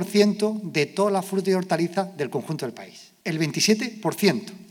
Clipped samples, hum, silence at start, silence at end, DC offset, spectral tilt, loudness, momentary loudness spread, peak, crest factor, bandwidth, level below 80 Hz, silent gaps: under 0.1%; none; 0 s; 0.05 s; under 0.1%; -4.5 dB/octave; -24 LUFS; 11 LU; -4 dBFS; 20 dB; 18 kHz; -84 dBFS; none